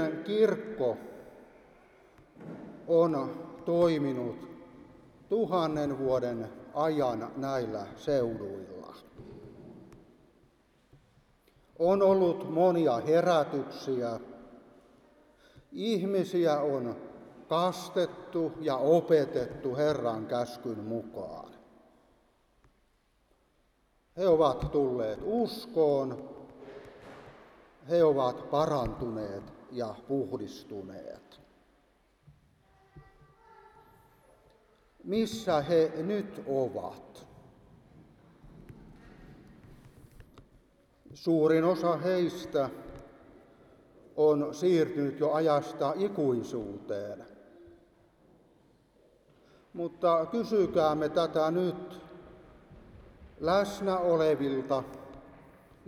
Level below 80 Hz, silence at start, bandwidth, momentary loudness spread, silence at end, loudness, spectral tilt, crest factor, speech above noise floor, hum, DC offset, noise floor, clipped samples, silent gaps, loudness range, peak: -60 dBFS; 0 s; 15 kHz; 22 LU; 0.55 s; -30 LUFS; -7 dB/octave; 20 dB; 41 dB; none; under 0.1%; -70 dBFS; under 0.1%; none; 11 LU; -12 dBFS